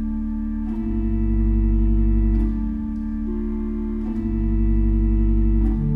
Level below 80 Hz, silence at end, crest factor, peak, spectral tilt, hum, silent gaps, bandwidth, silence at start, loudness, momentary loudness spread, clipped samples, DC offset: -22 dBFS; 0 s; 10 dB; -10 dBFS; -12 dB/octave; none; none; 2.8 kHz; 0 s; -23 LUFS; 6 LU; under 0.1%; under 0.1%